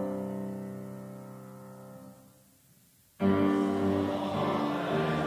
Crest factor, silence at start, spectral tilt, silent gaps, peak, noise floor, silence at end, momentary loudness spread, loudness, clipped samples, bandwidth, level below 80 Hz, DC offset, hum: 18 dB; 0 s; -7.5 dB/octave; none; -14 dBFS; -62 dBFS; 0 s; 21 LU; -30 LUFS; under 0.1%; 16 kHz; -58 dBFS; under 0.1%; none